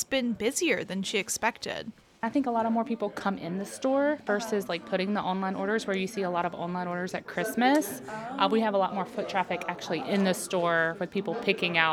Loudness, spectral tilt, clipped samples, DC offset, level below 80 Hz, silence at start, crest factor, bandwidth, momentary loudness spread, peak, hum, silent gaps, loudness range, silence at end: -29 LUFS; -4 dB/octave; under 0.1%; under 0.1%; -68 dBFS; 0 s; 22 dB; 17.5 kHz; 8 LU; -8 dBFS; none; none; 2 LU; 0 s